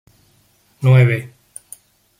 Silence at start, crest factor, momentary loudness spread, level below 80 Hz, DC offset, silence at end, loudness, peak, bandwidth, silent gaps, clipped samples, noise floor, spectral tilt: 0.8 s; 16 dB; 24 LU; -56 dBFS; under 0.1%; 0.95 s; -15 LUFS; -2 dBFS; 12 kHz; none; under 0.1%; -57 dBFS; -7.5 dB/octave